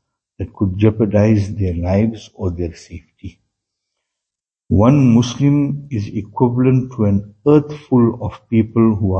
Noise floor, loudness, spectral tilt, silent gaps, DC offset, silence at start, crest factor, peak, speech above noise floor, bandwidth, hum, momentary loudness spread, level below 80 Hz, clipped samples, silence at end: -85 dBFS; -16 LUFS; -8.5 dB/octave; none; under 0.1%; 0.4 s; 16 dB; 0 dBFS; 70 dB; 8 kHz; none; 12 LU; -42 dBFS; under 0.1%; 0 s